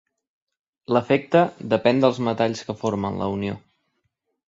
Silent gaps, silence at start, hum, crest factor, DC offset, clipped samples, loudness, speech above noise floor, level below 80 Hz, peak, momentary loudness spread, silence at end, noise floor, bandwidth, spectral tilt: none; 0.9 s; none; 20 dB; under 0.1%; under 0.1%; -22 LUFS; 53 dB; -56 dBFS; -4 dBFS; 9 LU; 0.9 s; -75 dBFS; 7.8 kHz; -6.5 dB/octave